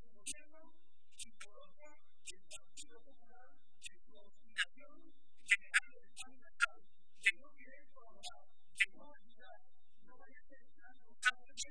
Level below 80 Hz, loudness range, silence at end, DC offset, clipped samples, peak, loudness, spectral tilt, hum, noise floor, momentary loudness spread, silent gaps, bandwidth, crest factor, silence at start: -78 dBFS; 17 LU; 0 s; 0.6%; under 0.1%; -16 dBFS; -38 LUFS; 1 dB/octave; none; -74 dBFS; 23 LU; none; 10.5 kHz; 30 dB; 0.25 s